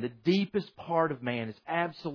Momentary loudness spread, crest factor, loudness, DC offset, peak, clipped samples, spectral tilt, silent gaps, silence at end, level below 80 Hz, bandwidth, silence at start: 6 LU; 18 dB; -31 LUFS; under 0.1%; -12 dBFS; under 0.1%; -7.5 dB/octave; none; 0 s; -72 dBFS; 5.4 kHz; 0 s